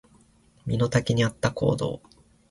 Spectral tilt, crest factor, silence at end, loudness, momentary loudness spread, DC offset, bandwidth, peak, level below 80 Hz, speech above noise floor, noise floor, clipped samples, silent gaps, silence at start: -6 dB/octave; 18 dB; 0.5 s; -25 LUFS; 12 LU; under 0.1%; 11.5 kHz; -8 dBFS; -50 dBFS; 34 dB; -59 dBFS; under 0.1%; none; 0.65 s